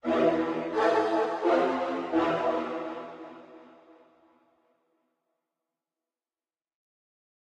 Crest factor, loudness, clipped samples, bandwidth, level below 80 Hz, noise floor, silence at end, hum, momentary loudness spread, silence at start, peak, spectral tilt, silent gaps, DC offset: 20 dB; -27 LUFS; under 0.1%; 9 kHz; -70 dBFS; under -90 dBFS; 3.8 s; none; 17 LU; 0.05 s; -12 dBFS; -6 dB/octave; none; under 0.1%